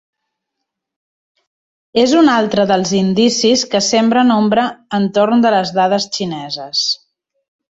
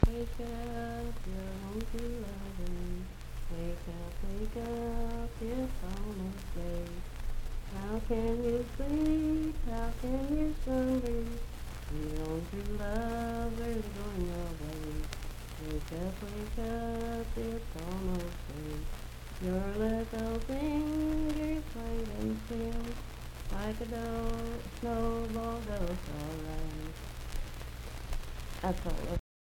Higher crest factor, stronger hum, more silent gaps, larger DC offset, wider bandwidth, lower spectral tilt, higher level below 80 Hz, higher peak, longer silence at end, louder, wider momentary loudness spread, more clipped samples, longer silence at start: second, 14 dB vs 28 dB; neither; neither; neither; second, 8 kHz vs 17 kHz; second, -4 dB/octave vs -6.5 dB/octave; second, -56 dBFS vs -38 dBFS; first, -2 dBFS vs -8 dBFS; first, 0.8 s vs 0.25 s; first, -14 LUFS vs -37 LUFS; second, 8 LU vs 11 LU; neither; first, 1.95 s vs 0 s